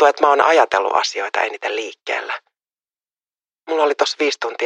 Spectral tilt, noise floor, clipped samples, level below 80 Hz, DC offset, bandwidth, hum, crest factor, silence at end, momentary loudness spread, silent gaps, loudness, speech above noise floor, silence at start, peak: -0.5 dB/octave; under -90 dBFS; under 0.1%; -70 dBFS; under 0.1%; 10.5 kHz; none; 18 dB; 0 s; 11 LU; none; -18 LUFS; over 72 dB; 0 s; 0 dBFS